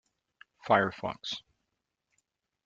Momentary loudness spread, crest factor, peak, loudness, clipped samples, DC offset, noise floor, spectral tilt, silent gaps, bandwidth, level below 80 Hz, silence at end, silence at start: 14 LU; 24 dB; -10 dBFS; -30 LUFS; under 0.1%; under 0.1%; -84 dBFS; -5 dB/octave; none; 7.6 kHz; -72 dBFS; 1.25 s; 0.65 s